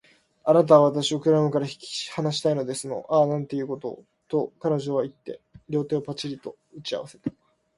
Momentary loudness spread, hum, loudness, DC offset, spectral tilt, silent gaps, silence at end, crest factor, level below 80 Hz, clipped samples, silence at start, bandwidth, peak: 17 LU; none; -24 LUFS; under 0.1%; -6 dB/octave; none; 0.45 s; 22 dB; -66 dBFS; under 0.1%; 0.45 s; 11.5 kHz; -4 dBFS